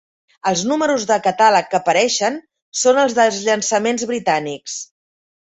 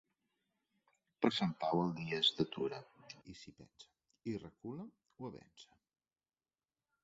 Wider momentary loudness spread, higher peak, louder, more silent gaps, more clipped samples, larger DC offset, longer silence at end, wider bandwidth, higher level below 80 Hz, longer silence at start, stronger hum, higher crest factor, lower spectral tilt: second, 13 LU vs 22 LU; first, -2 dBFS vs -16 dBFS; first, -17 LUFS vs -38 LUFS; first, 2.62-2.72 s vs none; neither; neither; second, 0.65 s vs 1.4 s; first, 8.4 kHz vs 7.6 kHz; first, -64 dBFS vs -76 dBFS; second, 0.45 s vs 1.2 s; neither; second, 16 dB vs 26 dB; about the same, -2.5 dB/octave vs -3.5 dB/octave